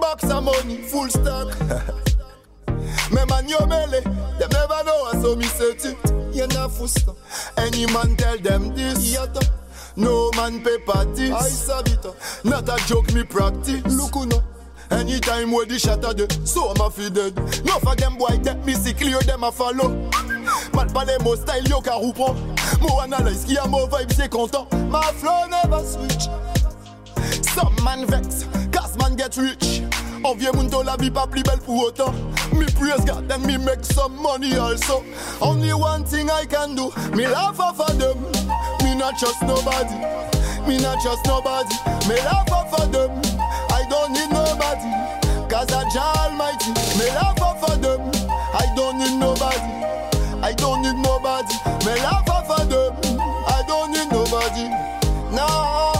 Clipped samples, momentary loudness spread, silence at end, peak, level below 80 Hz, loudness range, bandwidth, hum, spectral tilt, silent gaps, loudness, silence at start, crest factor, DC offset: under 0.1%; 4 LU; 0 s; -8 dBFS; -26 dBFS; 1 LU; 16 kHz; none; -4.5 dB/octave; none; -21 LUFS; 0 s; 12 dB; under 0.1%